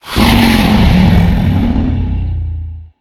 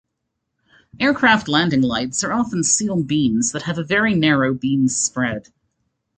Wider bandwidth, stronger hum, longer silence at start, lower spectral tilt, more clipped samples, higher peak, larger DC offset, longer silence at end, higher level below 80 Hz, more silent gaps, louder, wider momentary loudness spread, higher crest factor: first, 17 kHz vs 9.6 kHz; neither; second, 0.05 s vs 0.95 s; first, -6.5 dB/octave vs -3.5 dB/octave; first, 0.3% vs under 0.1%; about the same, 0 dBFS vs -2 dBFS; neither; second, 0.15 s vs 0.75 s; first, -18 dBFS vs -52 dBFS; neither; first, -11 LUFS vs -18 LUFS; first, 12 LU vs 6 LU; second, 10 dB vs 18 dB